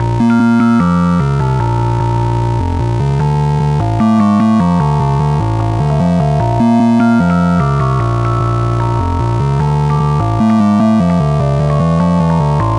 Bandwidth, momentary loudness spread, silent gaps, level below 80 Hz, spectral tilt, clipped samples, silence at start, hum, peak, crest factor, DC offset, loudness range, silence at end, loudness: 10.5 kHz; 4 LU; none; -26 dBFS; -8.5 dB/octave; under 0.1%; 0 s; none; 0 dBFS; 10 dB; under 0.1%; 1 LU; 0 s; -12 LUFS